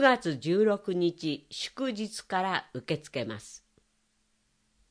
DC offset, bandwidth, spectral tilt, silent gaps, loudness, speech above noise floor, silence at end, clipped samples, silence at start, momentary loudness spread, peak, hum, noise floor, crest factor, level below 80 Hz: under 0.1%; 10.5 kHz; -5 dB/octave; none; -30 LUFS; 43 dB; 1.35 s; under 0.1%; 0 s; 12 LU; -8 dBFS; none; -73 dBFS; 24 dB; -72 dBFS